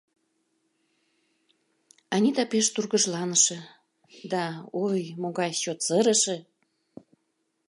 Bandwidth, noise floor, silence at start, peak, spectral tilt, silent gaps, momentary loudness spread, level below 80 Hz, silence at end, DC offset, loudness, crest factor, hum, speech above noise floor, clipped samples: 11.5 kHz; -76 dBFS; 2.1 s; -8 dBFS; -3 dB/octave; none; 11 LU; -82 dBFS; 1.3 s; under 0.1%; -25 LUFS; 20 dB; none; 50 dB; under 0.1%